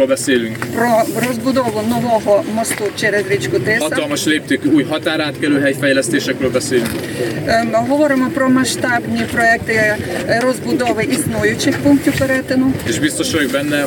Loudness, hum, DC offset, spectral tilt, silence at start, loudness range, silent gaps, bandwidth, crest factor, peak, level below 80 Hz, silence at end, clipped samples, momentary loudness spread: -15 LUFS; none; under 0.1%; -4.5 dB/octave; 0 s; 1 LU; none; 17.5 kHz; 14 dB; -2 dBFS; -46 dBFS; 0 s; under 0.1%; 4 LU